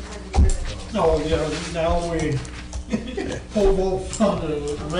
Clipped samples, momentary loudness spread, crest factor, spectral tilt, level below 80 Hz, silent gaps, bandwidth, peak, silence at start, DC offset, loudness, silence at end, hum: under 0.1%; 9 LU; 14 dB; -6 dB/octave; -28 dBFS; none; 10.5 kHz; -8 dBFS; 0 s; under 0.1%; -23 LUFS; 0 s; none